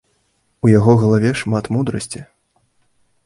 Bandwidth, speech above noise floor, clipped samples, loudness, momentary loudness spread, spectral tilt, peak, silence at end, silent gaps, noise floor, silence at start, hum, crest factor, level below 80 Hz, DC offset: 11.5 kHz; 49 dB; under 0.1%; -16 LUFS; 15 LU; -7 dB/octave; 0 dBFS; 1.05 s; none; -64 dBFS; 0.65 s; none; 18 dB; -46 dBFS; under 0.1%